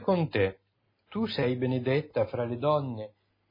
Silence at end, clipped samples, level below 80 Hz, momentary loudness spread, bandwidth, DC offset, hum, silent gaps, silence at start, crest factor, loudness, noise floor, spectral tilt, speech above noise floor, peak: 0.4 s; under 0.1%; -64 dBFS; 11 LU; 5.4 kHz; under 0.1%; none; none; 0 s; 16 dB; -29 LUFS; -72 dBFS; -9.5 dB/octave; 44 dB; -14 dBFS